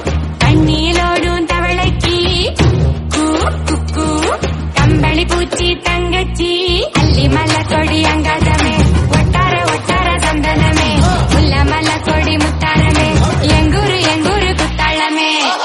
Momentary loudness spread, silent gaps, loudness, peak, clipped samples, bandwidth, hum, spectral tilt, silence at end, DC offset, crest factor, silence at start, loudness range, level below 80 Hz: 4 LU; none; -12 LUFS; 0 dBFS; under 0.1%; 11.5 kHz; none; -5 dB/octave; 0 s; under 0.1%; 12 dB; 0 s; 2 LU; -20 dBFS